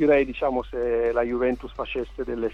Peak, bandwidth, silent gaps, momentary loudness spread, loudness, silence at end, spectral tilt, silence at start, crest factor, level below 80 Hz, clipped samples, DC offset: -8 dBFS; 6.6 kHz; none; 9 LU; -25 LUFS; 0 s; -7.5 dB/octave; 0 s; 16 dB; -42 dBFS; under 0.1%; under 0.1%